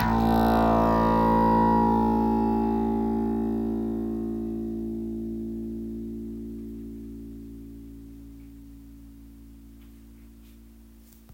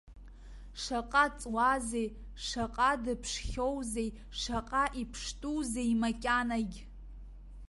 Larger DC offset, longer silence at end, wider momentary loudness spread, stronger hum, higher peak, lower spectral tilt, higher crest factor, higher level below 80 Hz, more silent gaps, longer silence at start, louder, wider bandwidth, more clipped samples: neither; first, 0.5 s vs 0 s; first, 23 LU vs 20 LU; neither; about the same, -12 dBFS vs -14 dBFS; first, -8.5 dB/octave vs -3.5 dB/octave; second, 14 dB vs 20 dB; first, -40 dBFS vs -48 dBFS; neither; about the same, 0 s vs 0.05 s; first, -25 LUFS vs -33 LUFS; first, 16.5 kHz vs 11.5 kHz; neither